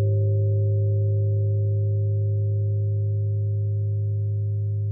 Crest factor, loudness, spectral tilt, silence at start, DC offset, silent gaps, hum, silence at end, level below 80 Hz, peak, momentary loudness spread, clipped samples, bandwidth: 8 dB; -24 LUFS; -16.5 dB/octave; 0 s; under 0.1%; none; none; 0 s; -58 dBFS; -14 dBFS; 3 LU; under 0.1%; 0.6 kHz